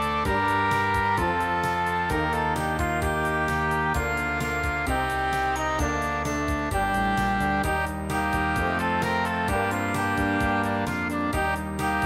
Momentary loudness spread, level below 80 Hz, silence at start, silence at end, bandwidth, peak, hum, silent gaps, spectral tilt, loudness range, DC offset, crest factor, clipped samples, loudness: 3 LU; -36 dBFS; 0 s; 0 s; 16 kHz; -12 dBFS; none; none; -5 dB/octave; 1 LU; under 0.1%; 12 dB; under 0.1%; -25 LUFS